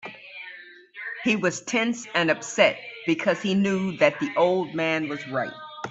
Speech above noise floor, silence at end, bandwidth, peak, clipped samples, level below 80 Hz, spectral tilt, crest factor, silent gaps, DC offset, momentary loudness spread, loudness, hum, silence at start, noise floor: 21 dB; 0 s; 8.2 kHz; -4 dBFS; under 0.1%; -68 dBFS; -4.5 dB/octave; 20 dB; none; under 0.1%; 17 LU; -24 LUFS; none; 0.05 s; -45 dBFS